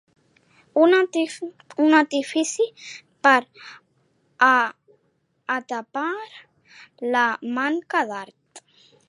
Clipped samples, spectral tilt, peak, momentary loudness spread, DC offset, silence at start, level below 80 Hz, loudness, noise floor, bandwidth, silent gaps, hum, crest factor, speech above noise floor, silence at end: under 0.1%; -2.5 dB/octave; -2 dBFS; 21 LU; under 0.1%; 0.75 s; -82 dBFS; -21 LUFS; -69 dBFS; 11.5 kHz; none; none; 22 dB; 47 dB; 0.5 s